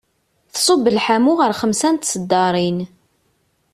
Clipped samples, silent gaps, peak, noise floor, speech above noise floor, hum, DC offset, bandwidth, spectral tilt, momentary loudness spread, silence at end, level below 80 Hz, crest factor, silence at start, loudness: under 0.1%; none; -4 dBFS; -64 dBFS; 48 dB; none; under 0.1%; 14.5 kHz; -4 dB/octave; 9 LU; 0.9 s; -58 dBFS; 14 dB; 0.55 s; -17 LUFS